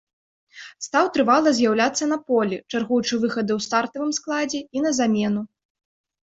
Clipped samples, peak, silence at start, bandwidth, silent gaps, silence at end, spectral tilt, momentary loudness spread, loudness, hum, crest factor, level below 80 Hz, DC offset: under 0.1%; -4 dBFS; 0.55 s; 8 kHz; none; 0.85 s; -4 dB/octave; 9 LU; -22 LUFS; none; 18 dB; -64 dBFS; under 0.1%